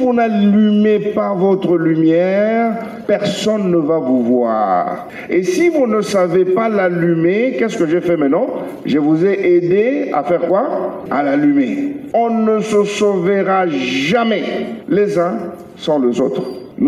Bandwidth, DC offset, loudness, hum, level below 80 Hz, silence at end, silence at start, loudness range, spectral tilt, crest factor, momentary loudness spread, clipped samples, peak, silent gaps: 12.5 kHz; under 0.1%; -15 LUFS; none; -58 dBFS; 0 s; 0 s; 1 LU; -6.5 dB/octave; 12 dB; 7 LU; under 0.1%; -4 dBFS; none